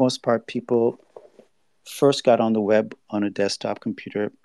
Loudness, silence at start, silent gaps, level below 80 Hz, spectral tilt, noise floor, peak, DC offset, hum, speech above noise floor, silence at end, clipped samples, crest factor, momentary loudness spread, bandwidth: -22 LUFS; 0 s; none; -76 dBFS; -5.5 dB/octave; -57 dBFS; -4 dBFS; under 0.1%; none; 34 dB; 0.15 s; under 0.1%; 18 dB; 10 LU; 13 kHz